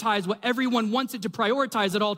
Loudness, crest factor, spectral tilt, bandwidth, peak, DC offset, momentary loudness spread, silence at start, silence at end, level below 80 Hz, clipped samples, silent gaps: -25 LUFS; 14 dB; -4.5 dB/octave; 16 kHz; -10 dBFS; under 0.1%; 3 LU; 0 s; 0 s; -74 dBFS; under 0.1%; none